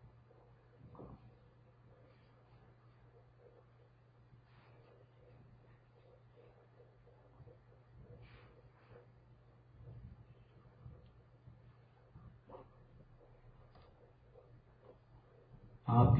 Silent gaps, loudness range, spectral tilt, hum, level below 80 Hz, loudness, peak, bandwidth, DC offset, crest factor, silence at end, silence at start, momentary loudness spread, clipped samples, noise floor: none; 5 LU; -10 dB/octave; none; -60 dBFS; -44 LUFS; -16 dBFS; 4.5 kHz; under 0.1%; 30 dB; 0 s; 1 s; 9 LU; under 0.1%; -66 dBFS